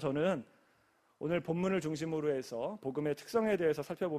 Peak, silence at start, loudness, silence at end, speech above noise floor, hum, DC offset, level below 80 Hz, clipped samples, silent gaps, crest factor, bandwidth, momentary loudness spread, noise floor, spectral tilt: -20 dBFS; 0 s; -35 LUFS; 0 s; 37 dB; none; under 0.1%; -70 dBFS; under 0.1%; none; 16 dB; 14.5 kHz; 7 LU; -71 dBFS; -6.5 dB/octave